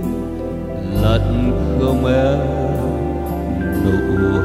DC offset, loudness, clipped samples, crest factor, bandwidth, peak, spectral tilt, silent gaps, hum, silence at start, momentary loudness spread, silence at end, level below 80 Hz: under 0.1%; -18 LUFS; under 0.1%; 16 dB; 15.5 kHz; -2 dBFS; -8 dB/octave; none; none; 0 s; 8 LU; 0 s; -26 dBFS